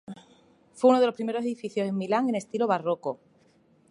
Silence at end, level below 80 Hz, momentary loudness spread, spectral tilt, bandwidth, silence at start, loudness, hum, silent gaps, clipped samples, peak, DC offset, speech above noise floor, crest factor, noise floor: 0.75 s; -78 dBFS; 16 LU; -6 dB/octave; 11.5 kHz; 0.1 s; -26 LUFS; none; none; under 0.1%; -8 dBFS; under 0.1%; 37 dB; 20 dB; -62 dBFS